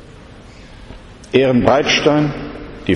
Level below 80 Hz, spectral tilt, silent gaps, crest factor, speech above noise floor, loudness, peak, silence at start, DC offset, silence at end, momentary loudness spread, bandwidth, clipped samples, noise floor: -40 dBFS; -5 dB/octave; none; 16 dB; 25 dB; -14 LUFS; 0 dBFS; 0.15 s; under 0.1%; 0 s; 15 LU; 10.5 kHz; under 0.1%; -38 dBFS